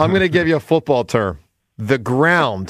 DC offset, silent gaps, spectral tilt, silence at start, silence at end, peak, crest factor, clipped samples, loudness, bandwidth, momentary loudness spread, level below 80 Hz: under 0.1%; none; -6.5 dB/octave; 0 s; 0 s; -2 dBFS; 14 dB; under 0.1%; -17 LUFS; 15 kHz; 10 LU; -46 dBFS